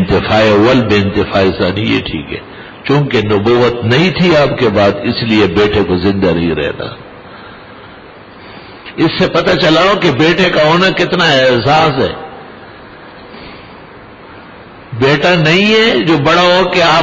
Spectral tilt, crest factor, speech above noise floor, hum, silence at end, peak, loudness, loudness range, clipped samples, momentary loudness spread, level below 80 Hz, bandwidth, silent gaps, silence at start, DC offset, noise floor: -6 dB/octave; 10 dB; 24 dB; none; 0 s; -2 dBFS; -10 LUFS; 8 LU; under 0.1%; 20 LU; -36 dBFS; 7.6 kHz; none; 0 s; under 0.1%; -34 dBFS